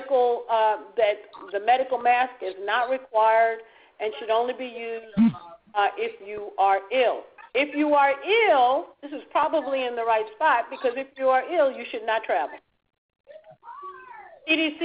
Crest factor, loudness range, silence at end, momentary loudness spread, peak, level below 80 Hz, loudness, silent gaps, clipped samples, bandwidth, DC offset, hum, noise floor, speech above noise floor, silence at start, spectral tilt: 16 dB; 5 LU; 0 s; 14 LU; -8 dBFS; -68 dBFS; -24 LUFS; 12.98-13.09 s, 13.20-13.24 s; under 0.1%; 5.2 kHz; under 0.1%; none; -45 dBFS; 21 dB; 0 s; -8.5 dB/octave